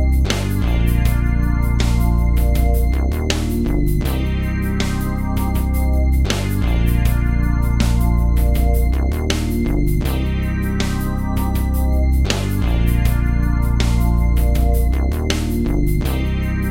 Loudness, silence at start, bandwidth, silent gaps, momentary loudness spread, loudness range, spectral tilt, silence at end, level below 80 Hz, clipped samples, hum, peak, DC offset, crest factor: -19 LUFS; 0 s; 16.5 kHz; none; 3 LU; 2 LU; -6.5 dB/octave; 0 s; -18 dBFS; under 0.1%; none; 0 dBFS; under 0.1%; 16 dB